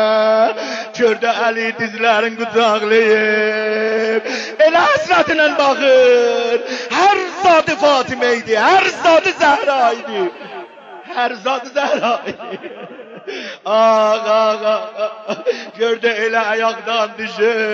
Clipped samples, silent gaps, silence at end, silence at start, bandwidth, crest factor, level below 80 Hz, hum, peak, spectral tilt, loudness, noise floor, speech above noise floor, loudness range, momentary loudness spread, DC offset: under 0.1%; none; 0 s; 0 s; 7.8 kHz; 14 dB; -62 dBFS; none; -2 dBFS; -3 dB/octave; -15 LUFS; -35 dBFS; 20 dB; 5 LU; 12 LU; under 0.1%